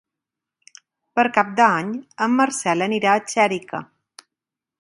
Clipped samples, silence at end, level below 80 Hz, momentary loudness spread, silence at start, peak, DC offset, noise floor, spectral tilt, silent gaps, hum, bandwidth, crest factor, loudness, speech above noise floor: under 0.1%; 0.95 s; -70 dBFS; 11 LU; 1.15 s; 0 dBFS; under 0.1%; -87 dBFS; -4 dB/octave; none; none; 11.5 kHz; 22 dB; -20 LUFS; 67 dB